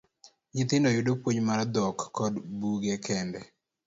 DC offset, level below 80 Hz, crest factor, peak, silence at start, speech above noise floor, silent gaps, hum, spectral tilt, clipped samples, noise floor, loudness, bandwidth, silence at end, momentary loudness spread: under 0.1%; -64 dBFS; 16 dB; -12 dBFS; 0.25 s; 32 dB; none; none; -5.5 dB/octave; under 0.1%; -60 dBFS; -29 LUFS; 8 kHz; 0.4 s; 8 LU